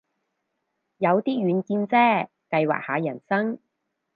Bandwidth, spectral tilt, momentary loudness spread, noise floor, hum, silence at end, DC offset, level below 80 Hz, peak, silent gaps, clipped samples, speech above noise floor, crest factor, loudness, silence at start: 5 kHz; -9 dB/octave; 8 LU; -78 dBFS; none; 0.6 s; under 0.1%; -76 dBFS; -8 dBFS; none; under 0.1%; 56 dB; 18 dB; -23 LUFS; 1 s